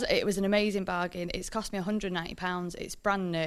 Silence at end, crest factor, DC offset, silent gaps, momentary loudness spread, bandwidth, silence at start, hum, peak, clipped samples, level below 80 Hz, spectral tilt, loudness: 0 s; 18 dB; under 0.1%; none; 7 LU; 14 kHz; 0 s; none; -12 dBFS; under 0.1%; -50 dBFS; -4.5 dB/octave; -31 LUFS